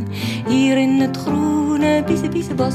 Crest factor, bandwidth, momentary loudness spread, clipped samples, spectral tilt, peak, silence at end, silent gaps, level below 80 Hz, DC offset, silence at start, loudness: 12 dB; 14 kHz; 6 LU; under 0.1%; -6 dB/octave; -4 dBFS; 0 s; none; -50 dBFS; under 0.1%; 0 s; -18 LUFS